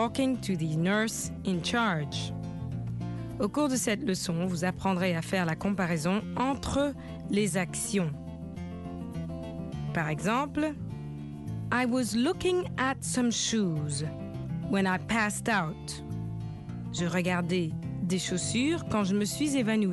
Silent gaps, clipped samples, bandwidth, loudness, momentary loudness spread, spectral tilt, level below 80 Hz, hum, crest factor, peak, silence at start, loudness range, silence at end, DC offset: none; under 0.1%; 12.5 kHz; -30 LUFS; 11 LU; -5 dB/octave; -52 dBFS; none; 18 dB; -12 dBFS; 0 s; 3 LU; 0 s; under 0.1%